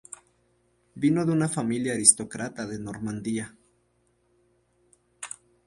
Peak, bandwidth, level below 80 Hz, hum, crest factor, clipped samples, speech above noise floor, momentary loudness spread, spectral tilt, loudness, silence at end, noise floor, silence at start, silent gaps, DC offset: -2 dBFS; 11.5 kHz; -64 dBFS; none; 26 dB; under 0.1%; 43 dB; 22 LU; -4 dB/octave; -25 LUFS; 0.4 s; -69 dBFS; 0.1 s; none; under 0.1%